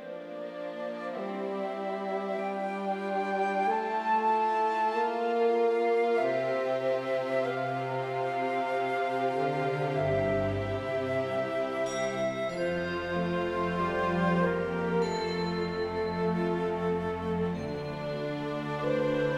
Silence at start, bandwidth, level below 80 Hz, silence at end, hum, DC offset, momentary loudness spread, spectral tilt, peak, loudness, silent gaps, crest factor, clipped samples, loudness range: 0 s; 12 kHz; -60 dBFS; 0 s; none; under 0.1%; 7 LU; -6.5 dB/octave; -16 dBFS; -30 LUFS; none; 14 dB; under 0.1%; 4 LU